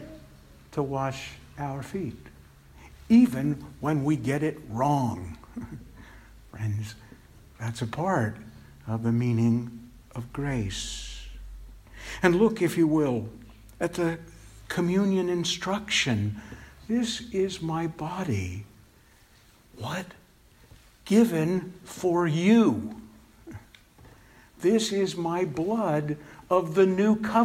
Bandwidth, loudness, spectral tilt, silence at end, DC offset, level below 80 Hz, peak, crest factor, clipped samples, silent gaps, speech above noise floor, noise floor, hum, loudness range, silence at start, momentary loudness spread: 16 kHz; -27 LUFS; -6 dB/octave; 0 s; under 0.1%; -52 dBFS; -6 dBFS; 20 dB; under 0.1%; none; 31 dB; -57 dBFS; none; 7 LU; 0 s; 20 LU